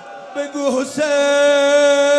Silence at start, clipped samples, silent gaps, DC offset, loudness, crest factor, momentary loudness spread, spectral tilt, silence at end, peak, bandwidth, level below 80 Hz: 0 s; under 0.1%; none; under 0.1%; -15 LUFS; 10 dB; 13 LU; -2 dB/octave; 0 s; -4 dBFS; 11.5 kHz; -70 dBFS